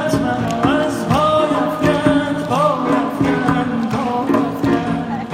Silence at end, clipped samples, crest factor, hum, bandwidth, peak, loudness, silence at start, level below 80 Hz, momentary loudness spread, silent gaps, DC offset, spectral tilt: 0 s; under 0.1%; 16 dB; none; 15.5 kHz; 0 dBFS; -17 LUFS; 0 s; -42 dBFS; 4 LU; none; under 0.1%; -6.5 dB/octave